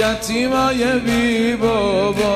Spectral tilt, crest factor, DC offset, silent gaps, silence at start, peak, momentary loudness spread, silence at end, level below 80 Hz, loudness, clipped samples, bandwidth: -4.5 dB/octave; 12 dB; under 0.1%; none; 0 s; -4 dBFS; 2 LU; 0 s; -38 dBFS; -17 LUFS; under 0.1%; 15 kHz